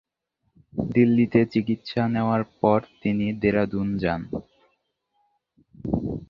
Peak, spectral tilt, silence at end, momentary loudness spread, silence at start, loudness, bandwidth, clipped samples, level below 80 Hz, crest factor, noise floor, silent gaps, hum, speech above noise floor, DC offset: -4 dBFS; -9.5 dB/octave; 0.05 s; 11 LU; 0.75 s; -24 LUFS; 5.8 kHz; under 0.1%; -50 dBFS; 20 dB; -75 dBFS; none; none; 52 dB; under 0.1%